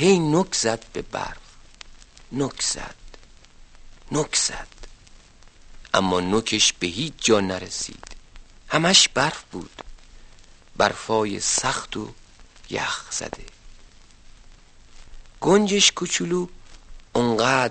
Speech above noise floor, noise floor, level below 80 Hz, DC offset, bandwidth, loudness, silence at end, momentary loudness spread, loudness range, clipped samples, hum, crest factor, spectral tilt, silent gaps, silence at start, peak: 26 dB; -49 dBFS; -46 dBFS; under 0.1%; 8.8 kHz; -22 LUFS; 0 s; 18 LU; 9 LU; under 0.1%; none; 22 dB; -3 dB/octave; none; 0 s; -2 dBFS